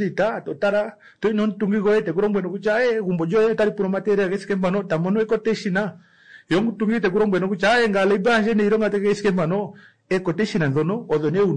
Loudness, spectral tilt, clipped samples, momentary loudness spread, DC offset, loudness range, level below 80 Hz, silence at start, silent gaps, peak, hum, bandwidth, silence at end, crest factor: -21 LUFS; -7 dB/octave; under 0.1%; 6 LU; 0.3%; 3 LU; -54 dBFS; 0 s; none; -10 dBFS; none; 10.5 kHz; 0 s; 10 dB